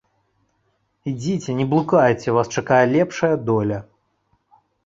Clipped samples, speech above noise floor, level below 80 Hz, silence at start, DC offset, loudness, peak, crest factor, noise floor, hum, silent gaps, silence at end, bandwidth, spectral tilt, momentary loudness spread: under 0.1%; 49 dB; -56 dBFS; 1.05 s; under 0.1%; -19 LUFS; -2 dBFS; 20 dB; -68 dBFS; none; none; 1.05 s; 7.8 kHz; -6.5 dB/octave; 11 LU